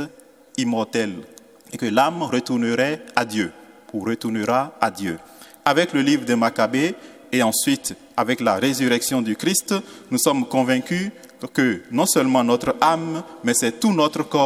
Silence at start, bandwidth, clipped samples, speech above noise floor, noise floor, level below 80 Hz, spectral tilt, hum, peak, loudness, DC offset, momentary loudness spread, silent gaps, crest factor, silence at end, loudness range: 0 s; 16.5 kHz; under 0.1%; 26 dB; -46 dBFS; -62 dBFS; -4 dB/octave; none; 0 dBFS; -21 LUFS; under 0.1%; 10 LU; none; 22 dB; 0 s; 3 LU